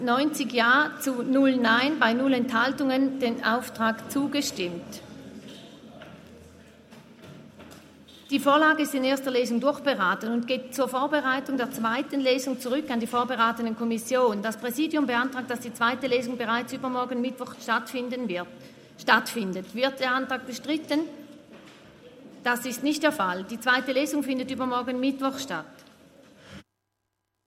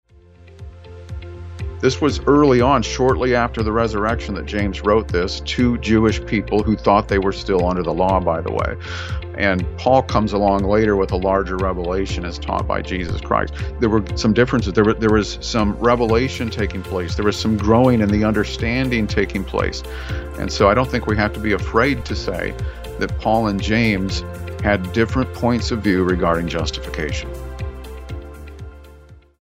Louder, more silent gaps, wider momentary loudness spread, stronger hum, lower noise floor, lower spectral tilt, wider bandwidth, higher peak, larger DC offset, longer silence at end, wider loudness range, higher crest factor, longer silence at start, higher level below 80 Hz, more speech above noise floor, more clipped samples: second, -26 LUFS vs -19 LUFS; neither; about the same, 11 LU vs 13 LU; neither; first, -80 dBFS vs -46 dBFS; second, -3.5 dB/octave vs -6 dB/octave; about the same, 16 kHz vs 16 kHz; second, -4 dBFS vs 0 dBFS; neither; first, 0.85 s vs 0.25 s; first, 7 LU vs 3 LU; about the same, 22 dB vs 18 dB; second, 0 s vs 0.4 s; second, -72 dBFS vs -30 dBFS; first, 54 dB vs 28 dB; neither